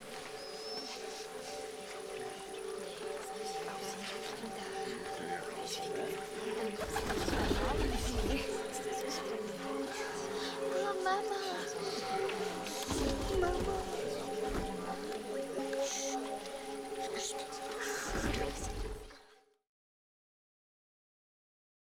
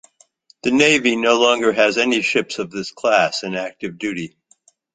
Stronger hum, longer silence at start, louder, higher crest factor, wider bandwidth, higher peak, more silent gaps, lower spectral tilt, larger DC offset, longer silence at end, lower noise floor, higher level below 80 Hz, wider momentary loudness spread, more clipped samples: neither; second, 0 s vs 0.65 s; second, -38 LUFS vs -18 LUFS; about the same, 18 dB vs 18 dB; first, over 20 kHz vs 9.4 kHz; second, -20 dBFS vs -2 dBFS; neither; about the same, -3.5 dB/octave vs -3 dB/octave; neither; first, 2.6 s vs 0.7 s; first, -64 dBFS vs -57 dBFS; first, -48 dBFS vs -60 dBFS; second, 9 LU vs 13 LU; neither